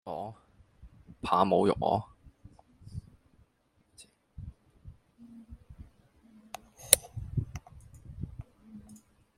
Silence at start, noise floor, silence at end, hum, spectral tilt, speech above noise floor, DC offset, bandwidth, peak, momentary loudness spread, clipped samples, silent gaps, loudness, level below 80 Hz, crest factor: 0.05 s; -71 dBFS; 0.4 s; none; -3.5 dB/octave; 43 dB; under 0.1%; 16 kHz; 0 dBFS; 29 LU; under 0.1%; none; -29 LUFS; -54 dBFS; 36 dB